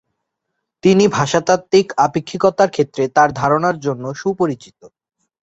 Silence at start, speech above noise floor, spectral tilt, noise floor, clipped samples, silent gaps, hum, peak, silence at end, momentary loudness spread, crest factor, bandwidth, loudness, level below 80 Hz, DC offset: 0.85 s; 61 dB; -5.5 dB/octave; -76 dBFS; under 0.1%; none; none; 0 dBFS; 0.55 s; 8 LU; 16 dB; 8.2 kHz; -16 LUFS; -54 dBFS; under 0.1%